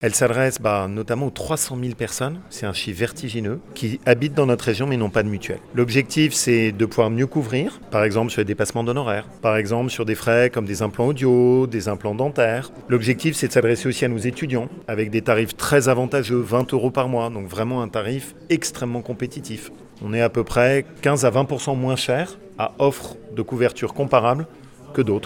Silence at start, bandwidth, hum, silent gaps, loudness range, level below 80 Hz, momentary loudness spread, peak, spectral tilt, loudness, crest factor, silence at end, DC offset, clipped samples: 0 s; 18 kHz; none; none; 4 LU; -50 dBFS; 10 LU; -2 dBFS; -5 dB/octave; -21 LUFS; 20 dB; 0 s; under 0.1%; under 0.1%